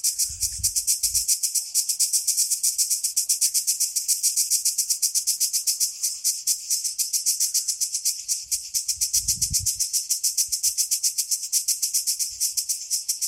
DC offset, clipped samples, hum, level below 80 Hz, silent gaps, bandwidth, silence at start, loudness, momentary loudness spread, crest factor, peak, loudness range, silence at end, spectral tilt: under 0.1%; under 0.1%; none; -52 dBFS; none; 16.5 kHz; 0.05 s; -21 LUFS; 4 LU; 20 dB; -4 dBFS; 2 LU; 0 s; 3 dB/octave